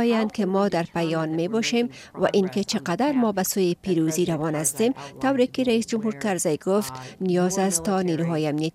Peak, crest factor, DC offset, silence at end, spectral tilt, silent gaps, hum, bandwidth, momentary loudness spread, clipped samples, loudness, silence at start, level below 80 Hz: -8 dBFS; 14 dB; under 0.1%; 0.05 s; -5 dB/octave; none; none; 16 kHz; 4 LU; under 0.1%; -24 LUFS; 0 s; -60 dBFS